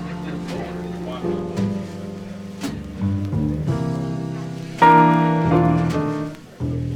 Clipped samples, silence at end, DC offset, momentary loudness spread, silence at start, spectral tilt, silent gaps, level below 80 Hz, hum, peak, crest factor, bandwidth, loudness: under 0.1%; 0 s; under 0.1%; 16 LU; 0 s; -7.5 dB/octave; none; -44 dBFS; none; -2 dBFS; 20 dB; 11.5 kHz; -21 LUFS